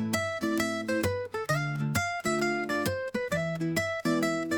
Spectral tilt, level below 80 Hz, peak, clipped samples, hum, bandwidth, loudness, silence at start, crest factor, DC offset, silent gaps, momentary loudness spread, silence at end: -5 dB/octave; -62 dBFS; -14 dBFS; under 0.1%; none; 19.5 kHz; -30 LUFS; 0 s; 16 dB; under 0.1%; none; 3 LU; 0 s